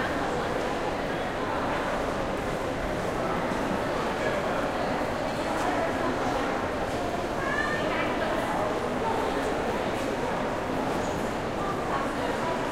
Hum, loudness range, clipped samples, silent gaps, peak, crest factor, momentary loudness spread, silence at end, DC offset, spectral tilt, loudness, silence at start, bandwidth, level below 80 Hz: none; 1 LU; under 0.1%; none; -14 dBFS; 14 dB; 3 LU; 0 s; under 0.1%; -5 dB/octave; -28 LUFS; 0 s; 16 kHz; -44 dBFS